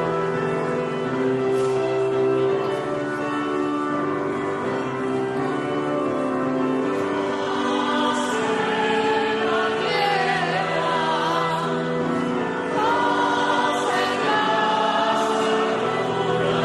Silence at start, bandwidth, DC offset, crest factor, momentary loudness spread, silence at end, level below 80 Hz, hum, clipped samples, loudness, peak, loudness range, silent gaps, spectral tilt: 0 s; 12 kHz; under 0.1%; 12 dB; 5 LU; 0 s; -60 dBFS; none; under 0.1%; -22 LUFS; -10 dBFS; 3 LU; none; -5 dB/octave